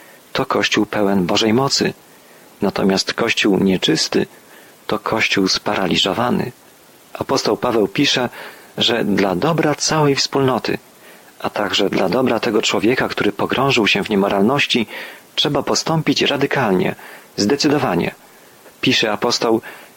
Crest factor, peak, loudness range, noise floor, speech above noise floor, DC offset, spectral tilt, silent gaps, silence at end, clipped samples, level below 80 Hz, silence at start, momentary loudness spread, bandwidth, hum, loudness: 14 dB; -4 dBFS; 2 LU; -46 dBFS; 29 dB; under 0.1%; -4 dB/octave; none; 0.1 s; under 0.1%; -52 dBFS; 0.35 s; 9 LU; 17 kHz; none; -17 LUFS